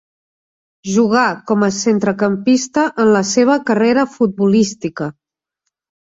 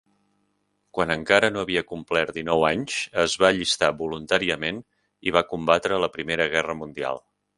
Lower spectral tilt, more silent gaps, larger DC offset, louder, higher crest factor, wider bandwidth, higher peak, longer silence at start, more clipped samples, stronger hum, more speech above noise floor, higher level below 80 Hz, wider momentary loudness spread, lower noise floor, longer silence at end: first, -5 dB/octave vs -3.5 dB/octave; neither; neither; first, -15 LUFS vs -23 LUFS; second, 14 dB vs 24 dB; second, 7.8 kHz vs 11.5 kHz; about the same, -2 dBFS vs 0 dBFS; about the same, 0.85 s vs 0.95 s; neither; second, none vs 50 Hz at -60 dBFS; first, 62 dB vs 48 dB; about the same, -58 dBFS vs -54 dBFS; second, 8 LU vs 11 LU; first, -76 dBFS vs -72 dBFS; first, 1 s vs 0.4 s